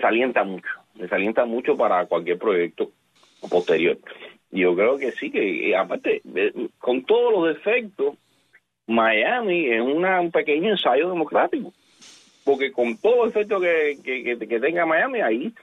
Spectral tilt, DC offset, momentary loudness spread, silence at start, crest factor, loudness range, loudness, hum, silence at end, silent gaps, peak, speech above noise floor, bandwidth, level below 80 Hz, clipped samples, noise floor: -6 dB/octave; under 0.1%; 8 LU; 0 s; 16 dB; 2 LU; -22 LUFS; none; 0.1 s; none; -6 dBFS; 39 dB; 7.6 kHz; -70 dBFS; under 0.1%; -61 dBFS